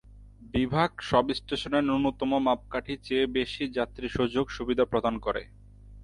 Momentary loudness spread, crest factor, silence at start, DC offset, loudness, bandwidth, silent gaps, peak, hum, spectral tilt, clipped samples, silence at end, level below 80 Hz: 6 LU; 20 dB; 0.1 s; under 0.1%; -28 LUFS; 11.5 kHz; none; -8 dBFS; none; -6.5 dB/octave; under 0.1%; 0 s; -48 dBFS